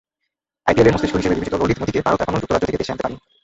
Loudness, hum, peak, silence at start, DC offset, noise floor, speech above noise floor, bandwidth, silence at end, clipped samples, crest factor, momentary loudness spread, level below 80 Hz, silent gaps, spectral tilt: -19 LUFS; none; 0 dBFS; 0.65 s; under 0.1%; -79 dBFS; 60 dB; 8 kHz; 0.25 s; under 0.1%; 18 dB; 9 LU; -40 dBFS; none; -6.5 dB/octave